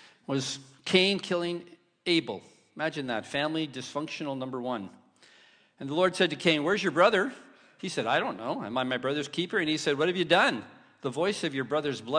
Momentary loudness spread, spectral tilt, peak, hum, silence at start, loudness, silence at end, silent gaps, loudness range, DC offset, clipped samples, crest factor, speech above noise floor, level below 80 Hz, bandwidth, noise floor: 13 LU; -4.5 dB/octave; -6 dBFS; none; 0.3 s; -28 LUFS; 0 s; none; 5 LU; under 0.1%; under 0.1%; 22 dB; 31 dB; -72 dBFS; 10.5 kHz; -60 dBFS